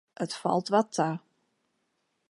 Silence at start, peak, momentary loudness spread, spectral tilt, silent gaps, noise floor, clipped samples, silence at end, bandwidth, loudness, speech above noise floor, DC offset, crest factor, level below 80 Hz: 0.2 s; -10 dBFS; 10 LU; -5.5 dB/octave; none; -77 dBFS; under 0.1%; 1.1 s; 11.5 kHz; -28 LUFS; 49 dB; under 0.1%; 22 dB; -82 dBFS